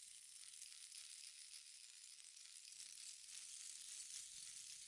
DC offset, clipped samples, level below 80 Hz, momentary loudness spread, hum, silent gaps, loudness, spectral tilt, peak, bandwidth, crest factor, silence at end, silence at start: under 0.1%; under 0.1%; under -90 dBFS; 6 LU; none; none; -54 LUFS; 4 dB/octave; -36 dBFS; 12 kHz; 22 dB; 0 s; 0 s